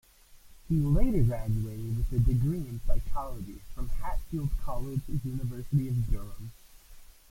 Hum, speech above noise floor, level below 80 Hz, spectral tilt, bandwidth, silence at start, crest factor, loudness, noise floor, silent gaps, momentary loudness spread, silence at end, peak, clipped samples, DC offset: none; 27 dB; -34 dBFS; -8.5 dB/octave; 16 kHz; 0.35 s; 18 dB; -32 LUFS; -54 dBFS; none; 14 LU; 0.25 s; -10 dBFS; under 0.1%; under 0.1%